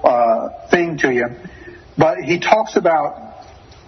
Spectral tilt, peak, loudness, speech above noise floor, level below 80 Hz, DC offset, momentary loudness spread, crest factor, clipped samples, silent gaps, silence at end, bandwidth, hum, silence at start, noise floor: -5.5 dB/octave; 0 dBFS; -17 LUFS; 24 dB; -50 dBFS; under 0.1%; 20 LU; 18 dB; under 0.1%; none; 0.45 s; 6.4 kHz; none; 0 s; -41 dBFS